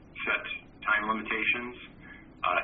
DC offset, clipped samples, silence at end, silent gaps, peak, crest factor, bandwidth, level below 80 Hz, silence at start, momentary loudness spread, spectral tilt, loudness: under 0.1%; under 0.1%; 0 s; none; -10 dBFS; 20 dB; 4.8 kHz; -58 dBFS; 0 s; 20 LU; -0.5 dB/octave; -29 LUFS